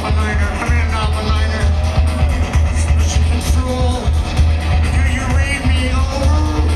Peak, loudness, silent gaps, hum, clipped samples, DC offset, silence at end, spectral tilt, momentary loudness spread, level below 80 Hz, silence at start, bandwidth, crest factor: -2 dBFS; -16 LUFS; none; none; under 0.1%; under 0.1%; 0 s; -5.5 dB/octave; 2 LU; -16 dBFS; 0 s; 12 kHz; 12 dB